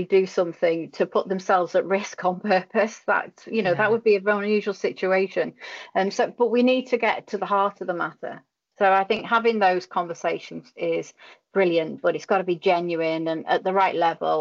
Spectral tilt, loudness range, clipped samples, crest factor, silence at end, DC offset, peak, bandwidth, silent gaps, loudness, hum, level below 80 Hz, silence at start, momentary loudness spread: -5.5 dB/octave; 2 LU; under 0.1%; 14 dB; 0 s; under 0.1%; -10 dBFS; 7.6 kHz; none; -23 LUFS; none; -74 dBFS; 0 s; 8 LU